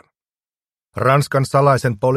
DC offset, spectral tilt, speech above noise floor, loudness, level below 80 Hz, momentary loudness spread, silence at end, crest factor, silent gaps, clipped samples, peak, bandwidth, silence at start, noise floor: under 0.1%; -6.5 dB/octave; over 75 dB; -16 LUFS; -54 dBFS; 5 LU; 0 s; 18 dB; none; under 0.1%; 0 dBFS; 14 kHz; 0.95 s; under -90 dBFS